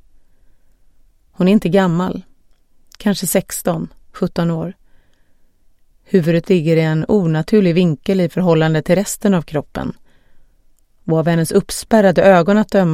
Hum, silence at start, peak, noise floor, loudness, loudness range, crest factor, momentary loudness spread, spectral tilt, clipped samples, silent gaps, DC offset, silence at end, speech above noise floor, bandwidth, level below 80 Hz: none; 1.4 s; 0 dBFS; -51 dBFS; -15 LUFS; 7 LU; 16 dB; 11 LU; -6.5 dB/octave; under 0.1%; none; under 0.1%; 0 s; 37 dB; 15.5 kHz; -44 dBFS